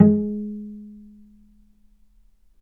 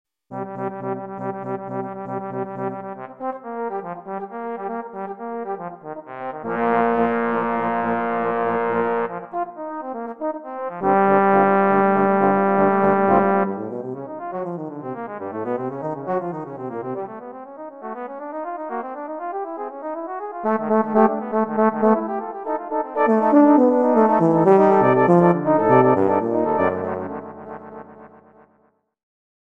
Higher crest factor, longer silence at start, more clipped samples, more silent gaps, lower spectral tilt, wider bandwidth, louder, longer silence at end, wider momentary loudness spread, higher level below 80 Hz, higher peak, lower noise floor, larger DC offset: about the same, 24 dB vs 20 dB; second, 0 s vs 0.3 s; neither; neither; first, -13.5 dB/octave vs -10 dB/octave; second, 2 kHz vs 4.3 kHz; second, -24 LUFS vs -21 LUFS; first, 1.65 s vs 1.5 s; first, 26 LU vs 16 LU; first, -58 dBFS vs -66 dBFS; about the same, 0 dBFS vs -2 dBFS; second, -57 dBFS vs -63 dBFS; second, under 0.1% vs 0.1%